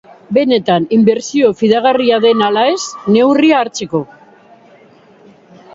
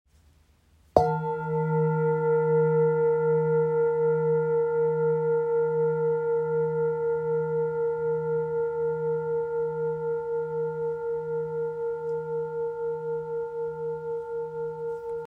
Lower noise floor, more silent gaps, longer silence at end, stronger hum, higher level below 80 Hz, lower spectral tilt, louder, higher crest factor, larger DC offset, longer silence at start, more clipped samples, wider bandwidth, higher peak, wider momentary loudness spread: second, -44 dBFS vs -61 dBFS; neither; first, 1.7 s vs 0 s; neither; about the same, -58 dBFS vs -60 dBFS; second, -5 dB/octave vs -10 dB/octave; first, -12 LUFS vs -27 LUFS; second, 14 dB vs 24 dB; neither; second, 0.3 s vs 0.95 s; neither; first, 7.8 kHz vs 5 kHz; about the same, 0 dBFS vs -2 dBFS; about the same, 8 LU vs 9 LU